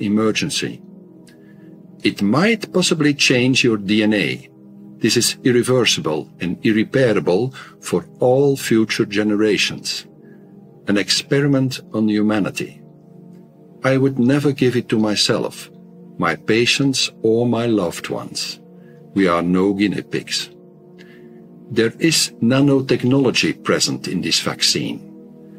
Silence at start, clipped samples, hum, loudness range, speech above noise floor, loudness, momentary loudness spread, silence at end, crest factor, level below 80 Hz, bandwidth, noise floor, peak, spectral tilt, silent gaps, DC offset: 0 s; under 0.1%; none; 3 LU; 26 dB; -18 LUFS; 10 LU; 0 s; 16 dB; -60 dBFS; 16 kHz; -43 dBFS; -2 dBFS; -4.5 dB/octave; none; under 0.1%